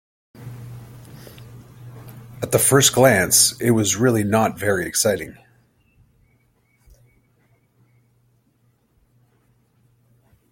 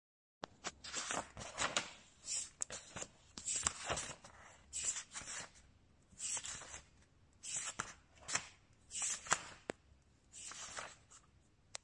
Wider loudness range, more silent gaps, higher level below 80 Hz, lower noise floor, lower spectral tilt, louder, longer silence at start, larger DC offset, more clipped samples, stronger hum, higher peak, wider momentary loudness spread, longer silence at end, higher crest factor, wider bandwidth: first, 10 LU vs 4 LU; neither; first, -56 dBFS vs -68 dBFS; second, -63 dBFS vs -70 dBFS; first, -3.5 dB/octave vs -0.5 dB/octave; first, -17 LUFS vs -43 LUFS; about the same, 0.4 s vs 0.4 s; neither; neither; neither; first, 0 dBFS vs -12 dBFS; first, 28 LU vs 16 LU; first, 5.2 s vs 0.05 s; second, 22 dB vs 34 dB; first, 17 kHz vs 11.5 kHz